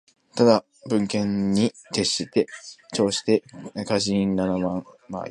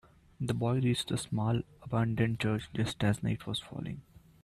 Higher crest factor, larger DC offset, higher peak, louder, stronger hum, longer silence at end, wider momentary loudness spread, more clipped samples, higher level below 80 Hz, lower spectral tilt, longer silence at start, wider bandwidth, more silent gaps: about the same, 20 dB vs 16 dB; neither; first, -2 dBFS vs -16 dBFS; first, -23 LUFS vs -33 LUFS; neither; second, 0 s vs 0.45 s; first, 14 LU vs 10 LU; neither; about the same, -56 dBFS vs -58 dBFS; about the same, -5 dB/octave vs -6 dB/octave; about the same, 0.35 s vs 0.4 s; second, 11.5 kHz vs 13.5 kHz; neither